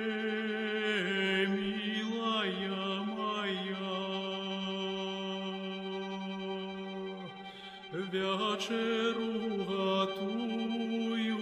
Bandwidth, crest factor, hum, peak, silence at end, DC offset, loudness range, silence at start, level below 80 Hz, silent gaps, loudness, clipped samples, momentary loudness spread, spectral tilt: 11 kHz; 16 dB; none; -20 dBFS; 0 s; under 0.1%; 6 LU; 0 s; -72 dBFS; none; -34 LUFS; under 0.1%; 9 LU; -5 dB/octave